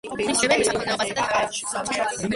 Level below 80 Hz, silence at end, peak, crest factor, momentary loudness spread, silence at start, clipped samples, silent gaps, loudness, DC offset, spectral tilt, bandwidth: -54 dBFS; 0 s; -6 dBFS; 18 dB; 6 LU; 0.05 s; under 0.1%; none; -22 LUFS; under 0.1%; -2.5 dB/octave; 11.5 kHz